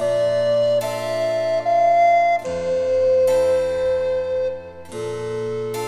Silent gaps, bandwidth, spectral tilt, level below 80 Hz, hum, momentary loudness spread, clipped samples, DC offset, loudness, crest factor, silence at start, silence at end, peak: none; 15.5 kHz; -4.5 dB/octave; -54 dBFS; none; 11 LU; under 0.1%; under 0.1%; -19 LUFS; 12 dB; 0 s; 0 s; -8 dBFS